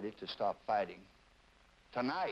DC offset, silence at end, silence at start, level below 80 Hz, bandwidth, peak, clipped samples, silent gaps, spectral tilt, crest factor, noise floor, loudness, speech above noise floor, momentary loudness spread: under 0.1%; 0 s; 0 s; -72 dBFS; 8.8 kHz; -22 dBFS; under 0.1%; none; -6 dB/octave; 18 dB; -66 dBFS; -38 LUFS; 28 dB; 8 LU